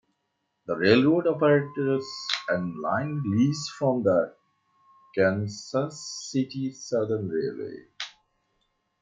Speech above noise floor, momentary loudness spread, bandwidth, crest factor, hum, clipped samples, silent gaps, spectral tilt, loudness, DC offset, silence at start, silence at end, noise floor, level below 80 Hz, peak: 52 dB; 14 LU; 9.2 kHz; 20 dB; none; under 0.1%; none; -5.5 dB/octave; -26 LUFS; under 0.1%; 0.7 s; 0.9 s; -77 dBFS; -70 dBFS; -6 dBFS